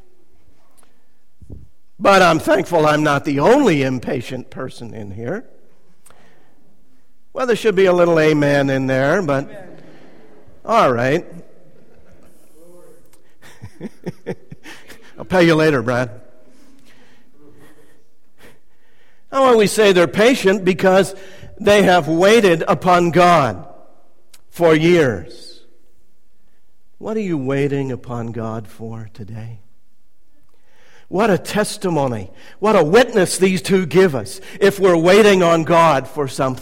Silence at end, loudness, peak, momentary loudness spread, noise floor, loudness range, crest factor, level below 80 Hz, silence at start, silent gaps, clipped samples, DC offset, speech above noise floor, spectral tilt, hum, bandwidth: 0 s; -15 LUFS; -2 dBFS; 20 LU; -62 dBFS; 13 LU; 16 dB; -48 dBFS; 1.5 s; none; under 0.1%; 2%; 47 dB; -5.5 dB/octave; none; 16.5 kHz